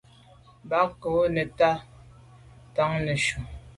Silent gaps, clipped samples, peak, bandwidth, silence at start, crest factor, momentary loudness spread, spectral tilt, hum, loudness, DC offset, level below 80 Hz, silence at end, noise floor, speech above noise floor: none; under 0.1%; -10 dBFS; 11.5 kHz; 0.65 s; 18 dB; 8 LU; -5 dB/octave; none; -26 LUFS; under 0.1%; -50 dBFS; 0.05 s; -54 dBFS; 29 dB